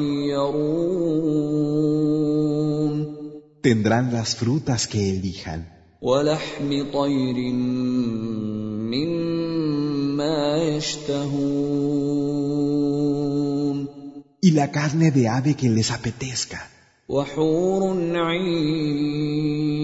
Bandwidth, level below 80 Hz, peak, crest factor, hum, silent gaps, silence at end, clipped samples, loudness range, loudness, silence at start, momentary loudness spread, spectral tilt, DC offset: 8 kHz; -52 dBFS; -6 dBFS; 16 dB; none; none; 0 s; under 0.1%; 2 LU; -23 LUFS; 0 s; 7 LU; -6 dB/octave; under 0.1%